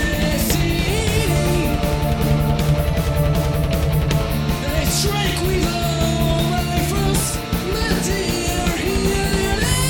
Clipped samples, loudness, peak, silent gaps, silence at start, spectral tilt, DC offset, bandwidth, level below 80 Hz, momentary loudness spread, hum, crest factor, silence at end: under 0.1%; -19 LUFS; -4 dBFS; none; 0 s; -5 dB/octave; under 0.1%; 19 kHz; -24 dBFS; 2 LU; none; 14 dB; 0 s